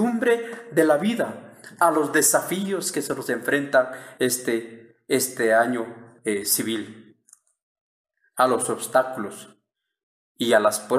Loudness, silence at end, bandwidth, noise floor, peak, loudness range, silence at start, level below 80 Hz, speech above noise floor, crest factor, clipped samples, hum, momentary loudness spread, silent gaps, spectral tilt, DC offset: -23 LUFS; 0 s; 15.5 kHz; -58 dBFS; -6 dBFS; 5 LU; 0 s; -72 dBFS; 36 dB; 18 dB; under 0.1%; none; 12 LU; 7.63-8.05 s, 10.03-10.35 s; -3 dB/octave; under 0.1%